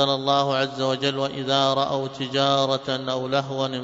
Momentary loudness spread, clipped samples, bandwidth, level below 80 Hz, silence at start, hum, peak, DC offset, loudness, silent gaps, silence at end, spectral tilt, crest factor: 6 LU; under 0.1%; 7.8 kHz; -64 dBFS; 0 s; none; -6 dBFS; under 0.1%; -23 LUFS; none; 0 s; -5 dB/octave; 16 dB